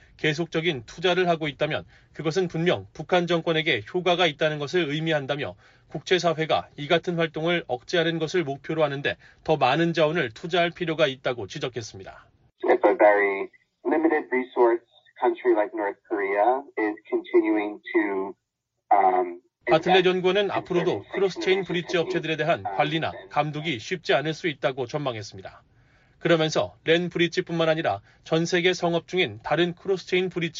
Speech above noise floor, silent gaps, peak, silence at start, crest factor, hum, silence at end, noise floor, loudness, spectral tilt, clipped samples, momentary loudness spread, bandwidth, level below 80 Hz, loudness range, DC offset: 56 dB; none; -6 dBFS; 0.2 s; 18 dB; none; 0 s; -80 dBFS; -24 LUFS; -3.5 dB/octave; under 0.1%; 9 LU; 7.6 kHz; -62 dBFS; 3 LU; under 0.1%